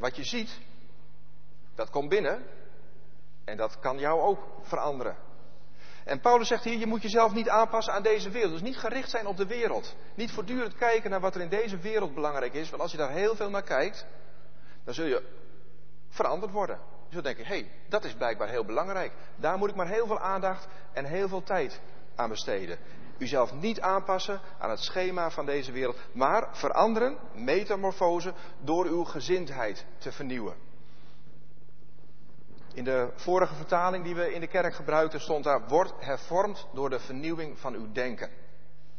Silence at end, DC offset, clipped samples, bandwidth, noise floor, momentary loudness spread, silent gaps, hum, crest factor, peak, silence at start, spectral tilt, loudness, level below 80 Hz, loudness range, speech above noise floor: 0.65 s; 2%; under 0.1%; 6.6 kHz; -58 dBFS; 12 LU; none; none; 22 dB; -8 dBFS; 0 s; -5 dB/octave; -30 LUFS; -62 dBFS; 7 LU; 29 dB